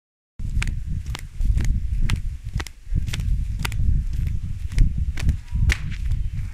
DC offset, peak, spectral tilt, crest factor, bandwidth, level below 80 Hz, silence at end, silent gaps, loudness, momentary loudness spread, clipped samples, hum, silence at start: under 0.1%; -4 dBFS; -5 dB/octave; 18 dB; 14 kHz; -24 dBFS; 0 s; none; -27 LUFS; 7 LU; under 0.1%; none; 0.4 s